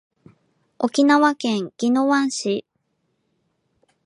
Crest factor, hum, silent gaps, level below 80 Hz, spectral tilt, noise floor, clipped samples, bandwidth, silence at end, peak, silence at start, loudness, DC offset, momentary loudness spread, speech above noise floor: 18 dB; none; none; -74 dBFS; -4 dB/octave; -71 dBFS; under 0.1%; 11 kHz; 1.45 s; -4 dBFS; 0.8 s; -20 LUFS; under 0.1%; 10 LU; 52 dB